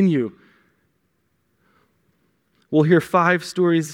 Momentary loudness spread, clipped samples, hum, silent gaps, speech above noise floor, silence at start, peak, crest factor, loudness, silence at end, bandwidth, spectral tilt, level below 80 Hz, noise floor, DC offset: 7 LU; under 0.1%; none; none; 51 dB; 0 s; -2 dBFS; 20 dB; -19 LUFS; 0 s; 16 kHz; -6.5 dB/octave; -68 dBFS; -69 dBFS; under 0.1%